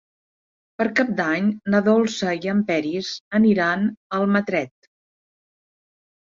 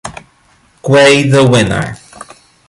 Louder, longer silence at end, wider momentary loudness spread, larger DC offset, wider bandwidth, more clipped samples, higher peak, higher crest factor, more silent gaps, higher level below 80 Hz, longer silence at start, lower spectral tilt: second, -21 LUFS vs -9 LUFS; first, 1.55 s vs 0.45 s; second, 8 LU vs 19 LU; neither; second, 7.6 kHz vs 11.5 kHz; neither; second, -6 dBFS vs 0 dBFS; first, 18 dB vs 12 dB; first, 3.20-3.31 s, 3.97-4.10 s vs none; second, -64 dBFS vs -40 dBFS; first, 0.8 s vs 0.05 s; about the same, -6 dB/octave vs -5 dB/octave